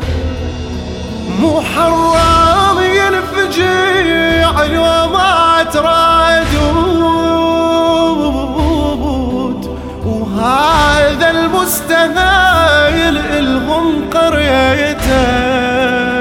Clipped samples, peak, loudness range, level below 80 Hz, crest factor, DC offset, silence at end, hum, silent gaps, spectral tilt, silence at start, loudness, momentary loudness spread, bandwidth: under 0.1%; 0 dBFS; 3 LU; -24 dBFS; 12 dB; under 0.1%; 0 s; none; none; -4.5 dB/octave; 0 s; -11 LUFS; 10 LU; 16.5 kHz